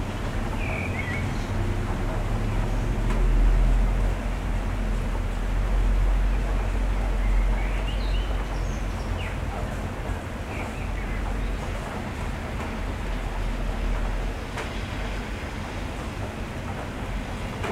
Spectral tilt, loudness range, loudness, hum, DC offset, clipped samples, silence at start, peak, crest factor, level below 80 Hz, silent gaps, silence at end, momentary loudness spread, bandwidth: -6 dB/octave; 5 LU; -29 LUFS; none; under 0.1%; under 0.1%; 0 s; -12 dBFS; 14 dB; -26 dBFS; none; 0 s; 7 LU; 11.5 kHz